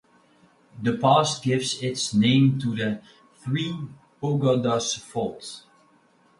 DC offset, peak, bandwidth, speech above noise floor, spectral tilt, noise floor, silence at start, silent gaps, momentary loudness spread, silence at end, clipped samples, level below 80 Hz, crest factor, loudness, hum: under 0.1%; -6 dBFS; 11.5 kHz; 37 dB; -5 dB/octave; -60 dBFS; 0.75 s; none; 17 LU; 0.8 s; under 0.1%; -62 dBFS; 18 dB; -24 LUFS; none